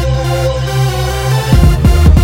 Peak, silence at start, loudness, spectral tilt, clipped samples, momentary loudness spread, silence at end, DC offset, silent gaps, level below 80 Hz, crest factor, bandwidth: 0 dBFS; 0 s; -12 LUFS; -6 dB/octave; 1%; 6 LU; 0 s; under 0.1%; none; -12 dBFS; 10 dB; 17 kHz